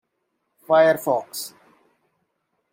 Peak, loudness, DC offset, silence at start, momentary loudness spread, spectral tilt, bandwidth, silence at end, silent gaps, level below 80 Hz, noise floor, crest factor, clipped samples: -6 dBFS; -20 LUFS; under 0.1%; 0.7 s; 16 LU; -4 dB/octave; 16.5 kHz; 1.25 s; none; -80 dBFS; -75 dBFS; 20 dB; under 0.1%